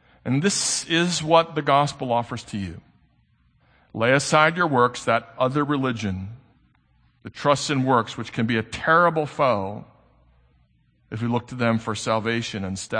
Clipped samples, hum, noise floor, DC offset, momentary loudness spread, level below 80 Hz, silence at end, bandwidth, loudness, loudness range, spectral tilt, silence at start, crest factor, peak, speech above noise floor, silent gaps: under 0.1%; none; -62 dBFS; under 0.1%; 13 LU; -58 dBFS; 0 s; 9.8 kHz; -22 LUFS; 3 LU; -4.5 dB/octave; 0.25 s; 22 dB; -2 dBFS; 40 dB; none